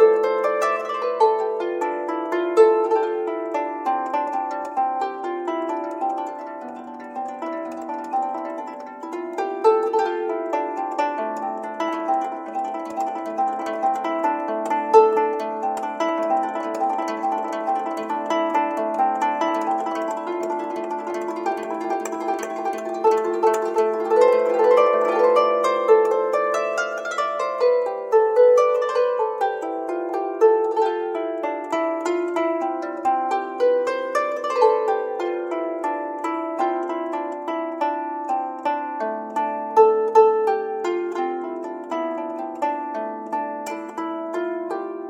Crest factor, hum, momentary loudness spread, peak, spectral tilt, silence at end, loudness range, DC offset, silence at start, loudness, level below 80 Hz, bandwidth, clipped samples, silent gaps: 20 dB; none; 11 LU; -2 dBFS; -4 dB/octave; 0 s; 7 LU; under 0.1%; 0 s; -22 LUFS; -76 dBFS; 11 kHz; under 0.1%; none